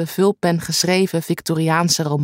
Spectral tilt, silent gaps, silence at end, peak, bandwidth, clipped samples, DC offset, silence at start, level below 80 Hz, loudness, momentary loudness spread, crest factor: -4.5 dB/octave; none; 0 s; -4 dBFS; 16.5 kHz; under 0.1%; under 0.1%; 0 s; -58 dBFS; -18 LUFS; 4 LU; 16 dB